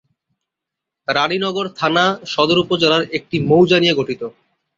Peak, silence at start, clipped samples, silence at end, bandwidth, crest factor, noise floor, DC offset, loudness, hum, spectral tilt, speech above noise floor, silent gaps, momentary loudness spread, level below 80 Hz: 0 dBFS; 1.1 s; under 0.1%; 0.5 s; 7.6 kHz; 16 dB; -83 dBFS; under 0.1%; -16 LUFS; none; -5.5 dB/octave; 67 dB; none; 10 LU; -56 dBFS